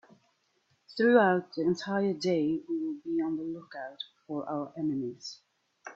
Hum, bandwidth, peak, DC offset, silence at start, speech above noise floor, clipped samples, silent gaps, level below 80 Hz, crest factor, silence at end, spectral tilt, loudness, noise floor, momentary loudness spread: none; 7.8 kHz; -10 dBFS; under 0.1%; 0.9 s; 43 dB; under 0.1%; none; -74 dBFS; 20 dB; 0 s; -6 dB/octave; -30 LUFS; -73 dBFS; 19 LU